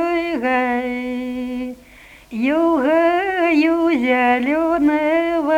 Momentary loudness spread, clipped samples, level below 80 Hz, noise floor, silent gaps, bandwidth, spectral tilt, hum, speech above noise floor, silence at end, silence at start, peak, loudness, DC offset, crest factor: 10 LU; under 0.1%; -50 dBFS; -44 dBFS; none; 13 kHz; -5 dB/octave; 50 Hz at -55 dBFS; 27 dB; 0 s; 0 s; -4 dBFS; -18 LUFS; under 0.1%; 14 dB